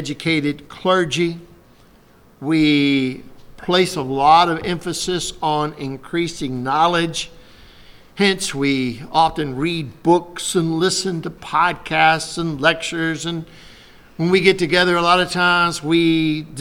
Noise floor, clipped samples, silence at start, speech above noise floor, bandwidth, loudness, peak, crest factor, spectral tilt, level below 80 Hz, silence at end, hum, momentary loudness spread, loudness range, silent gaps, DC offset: -50 dBFS; under 0.1%; 0 s; 31 dB; 16.5 kHz; -18 LUFS; 0 dBFS; 18 dB; -4.5 dB/octave; -48 dBFS; 0 s; none; 10 LU; 4 LU; none; under 0.1%